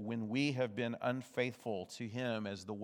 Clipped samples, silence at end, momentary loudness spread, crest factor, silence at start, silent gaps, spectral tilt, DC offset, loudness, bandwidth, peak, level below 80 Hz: under 0.1%; 0 s; 7 LU; 18 dB; 0 s; none; -6 dB/octave; under 0.1%; -39 LUFS; 17.5 kHz; -20 dBFS; -88 dBFS